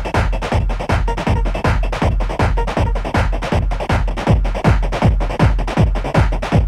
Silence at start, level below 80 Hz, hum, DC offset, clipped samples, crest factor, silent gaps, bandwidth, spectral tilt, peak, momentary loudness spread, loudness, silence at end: 0 s; -18 dBFS; none; under 0.1%; under 0.1%; 14 dB; none; 11.5 kHz; -7 dB/octave; -2 dBFS; 3 LU; -18 LUFS; 0 s